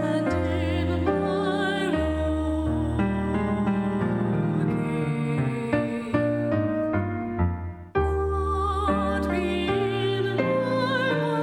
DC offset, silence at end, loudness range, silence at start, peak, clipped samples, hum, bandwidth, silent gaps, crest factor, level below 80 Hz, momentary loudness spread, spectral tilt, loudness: under 0.1%; 0 s; 1 LU; 0 s; -8 dBFS; under 0.1%; none; 10.5 kHz; none; 16 dB; -38 dBFS; 2 LU; -7.5 dB/octave; -25 LUFS